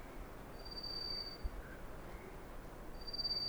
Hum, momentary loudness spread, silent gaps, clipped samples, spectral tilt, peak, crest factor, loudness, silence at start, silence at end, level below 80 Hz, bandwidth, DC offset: none; 12 LU; none; under 0.1%; -4 dB/octave; -30 dBFS; 16 dB; -46 LUFS; 0 s; 0 s; -52 dBFS; over 20 kHz; under 0.1%